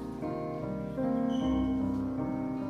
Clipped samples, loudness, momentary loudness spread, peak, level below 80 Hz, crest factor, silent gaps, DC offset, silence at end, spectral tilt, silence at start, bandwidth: under 0.1%; -32 LUFS; 6 LU; -20 dBFS; -48 dBFS; 12 dB; none; under 0.1%; 0 s; -8.5 dB/octave; 0 s; 6.6 kHz